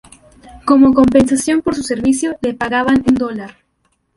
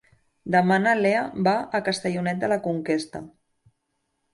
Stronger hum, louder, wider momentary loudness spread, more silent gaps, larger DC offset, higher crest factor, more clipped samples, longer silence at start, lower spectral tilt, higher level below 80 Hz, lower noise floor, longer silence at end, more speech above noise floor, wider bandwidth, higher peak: neither; first, -14 LUFS vs -23 LUFS; first, 13 LU vs 8 LU; neither; neither; about the same, 14 dB vs 18 dB; neither; about the same, 0.45 s vs 0.45 s; about the same, -5 dB/octave vs -6 dB/octave; first, -42 dBFS vs -64 dBFS; second, -64 dBFS vs -76 dBFS; second, 0.7 s vs 1.05 s; about the same, 51 dB vs 53 dB; about the same, 11.5 kHz vs 11.5 kHz; first, 0 dBFS vs -8 dBFS